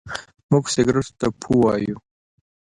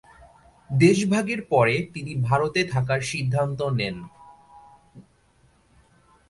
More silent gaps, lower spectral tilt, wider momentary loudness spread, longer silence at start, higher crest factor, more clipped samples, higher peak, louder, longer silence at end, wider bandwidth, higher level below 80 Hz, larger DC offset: first, 0.43-0.49 s vs none; about the same, -6 dB/octave vs -6 dB/octave; first, 15 LU vs 11 LU; second, 0.05 s vs 0.7 s; about the same, 18 dB vs 20 dB; neither; about the same, -4 dBFS vs -4 dBFS; first, -20 LUFS vs -23 LUFS; second, 0.65 s vs 1.3 s; about the same, 11.5 kHz vs 11.5 kHz; first, -48 dBFS vs -56 dBFS; neither